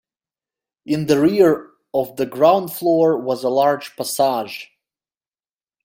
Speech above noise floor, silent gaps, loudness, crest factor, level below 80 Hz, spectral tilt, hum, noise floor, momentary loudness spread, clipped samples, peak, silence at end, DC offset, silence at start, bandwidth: over 73 dB; none; -18 LUFS; 18 dB; -62 dBFS; -5.5 dB/octave; none; under -90 dBFS; 10 LU; under 0.1%; -2 dBFS; 1.2 s; under 0.1%; 0.9 s; 17 kHz